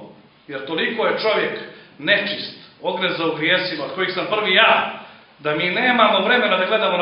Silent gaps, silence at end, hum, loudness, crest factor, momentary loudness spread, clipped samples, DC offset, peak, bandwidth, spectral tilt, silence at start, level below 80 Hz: none; 0 s; none; -18 LUFS; 20 dB; 14 LU; under 0.1%; under 0.1%; 0 dBFS; 5.6 kHz; -7.5 dB/octave; 0 s; -68 dBFS